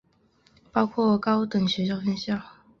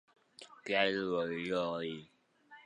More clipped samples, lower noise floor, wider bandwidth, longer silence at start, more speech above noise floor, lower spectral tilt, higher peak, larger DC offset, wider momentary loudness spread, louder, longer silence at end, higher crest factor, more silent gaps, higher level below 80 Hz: neither; about the same, -63 dBFS vs -61 dBFS; second, 6.8 kHz vs 10.5 kHz; first, 0.75 s vs 0.4 s; first, 39 dB vs 26 dB; first, -6.5 dB/octave vs -5 dB/octave; first, -6 dBFS vs -14 dBFS; neither; second, 7 LU vs 19 LU; first, -25 LUFS vs -35 LUFS; first, 0.3 s vs 0.05 s; about the same, 20 dB vs 24 dB; neither; first, -60 dBFS vs -74 dBFS